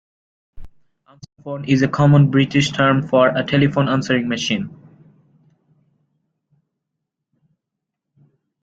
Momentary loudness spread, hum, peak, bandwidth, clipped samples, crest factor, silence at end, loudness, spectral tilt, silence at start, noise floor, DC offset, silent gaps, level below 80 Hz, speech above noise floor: 13 LU; none; -2 dBFS; 7.8 kHz; under 0.1%; 18 dB; 3.9 s; -17 LUFS; -6.5 dB/octave; 0.55 s; -81 dBFS; under 0.1%; none; -50 dBFS; 65 dB